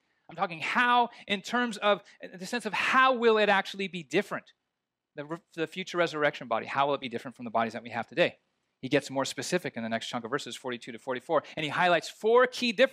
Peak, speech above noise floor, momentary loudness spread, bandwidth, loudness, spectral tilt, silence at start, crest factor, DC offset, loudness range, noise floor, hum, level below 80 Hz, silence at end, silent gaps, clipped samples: -10 dBFS; 57 dB; 14 LU; 15 kHz; -28 LUFS; -4 dB/octave; 0.3 s; 20 dB; under 0.1%; 6 LU; -86 dBFS; none; -80 dBFS; 0 s; none; under 0.1%